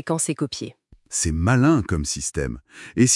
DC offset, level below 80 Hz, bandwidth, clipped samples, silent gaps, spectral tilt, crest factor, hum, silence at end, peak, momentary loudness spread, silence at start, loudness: under 0.1%; -40 dBFS; 12 kHz; under 0.1%; none; -4.5 dB/octave; 18 dB; none; 0 s; -4 dBFS; 14 LU; 0.05 s; -22 LUFS